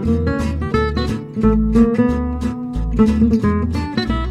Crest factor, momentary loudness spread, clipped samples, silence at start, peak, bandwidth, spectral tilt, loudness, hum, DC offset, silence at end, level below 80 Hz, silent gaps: 16 dB; 8 LU; under 0.1%; 0 s; 0 dBFS; 10.5 kHz; -8 dB/octave; -18 LUFS; none; under 0.1%; 0 s; -24 dBFS; none